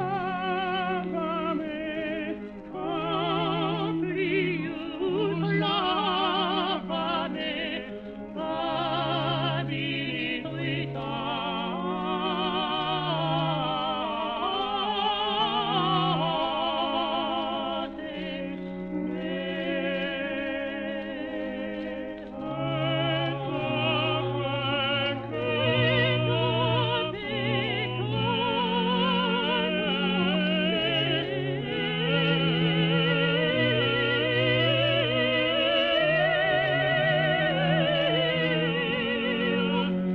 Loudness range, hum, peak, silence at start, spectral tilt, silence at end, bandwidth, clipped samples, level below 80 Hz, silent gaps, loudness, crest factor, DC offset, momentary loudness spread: 7 LU; none; -12 dBFS; 0 s; -8 dB/octave; 0 s; 5.8 kHz; under 0.1%; -56 dBFS; none; -26 LUFS; 16 dB; under 0.1%; 9 LU